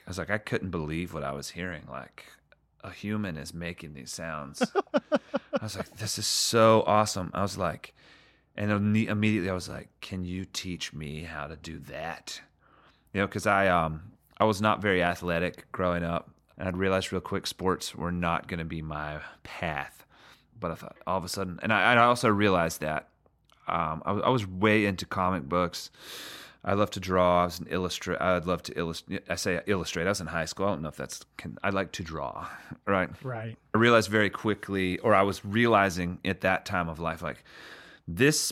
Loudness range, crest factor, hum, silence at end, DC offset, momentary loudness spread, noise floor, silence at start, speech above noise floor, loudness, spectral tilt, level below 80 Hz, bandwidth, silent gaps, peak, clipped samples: 9 LU; 22 dB; none; 0 s; under 0.1%; 16 LU; -65 dBFS; 0.05 s; 36 dB; -28 LUFS; -4.5 dB/octave; -54 dBFS; 16.5 kHz; none; -6 dBFS; under 0.1%